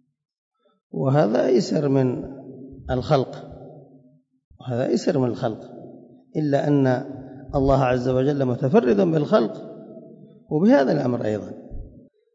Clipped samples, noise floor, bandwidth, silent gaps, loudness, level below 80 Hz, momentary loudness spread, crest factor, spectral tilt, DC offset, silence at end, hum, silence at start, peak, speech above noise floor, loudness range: under 0.1%; -55 dBFS; 7.8 kHz; 4.44-4.51 s; -21 LUFS; -46 dBFS; 21 LU; 16 dB; -8 dB/octave; under 0.1%; 0.45 s; none; 0.95 s; -6 dBFS; 35 dB; 6 LU